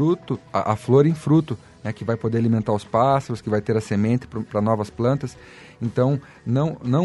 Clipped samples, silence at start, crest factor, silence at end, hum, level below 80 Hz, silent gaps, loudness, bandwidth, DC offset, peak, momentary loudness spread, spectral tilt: under 0.1%; 0 s; 18 dB; 0 s; none; -54 dBFS; none; -22 LUFS; 11.5 kHz; under 0.1%; -4 dBFS; 9 LU; -8.5 dB/octave